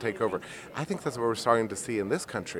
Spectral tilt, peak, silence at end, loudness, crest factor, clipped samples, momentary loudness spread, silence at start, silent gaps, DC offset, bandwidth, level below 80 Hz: -4.5 dB/octave; -8 dBFS; 0 s; -30 LUFS; 22 dB; under 0.1%; 11 LU; 0 s; none; under 0.1%; 16.5 kHz; -64 dBFS